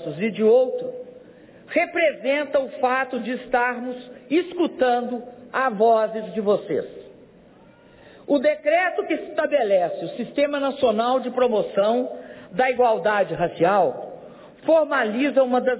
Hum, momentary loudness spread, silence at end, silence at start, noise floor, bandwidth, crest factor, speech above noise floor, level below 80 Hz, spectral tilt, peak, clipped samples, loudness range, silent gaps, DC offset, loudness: none; 12 LU; 0 s; 0 s; -50 dBFS; 4 kHz; 14 dB; 29 dB; -64 dBFS; -9 dB/octave; -8 dBFS; under 0.1%; 3 LU; none; under 0.1%; -22 LUFS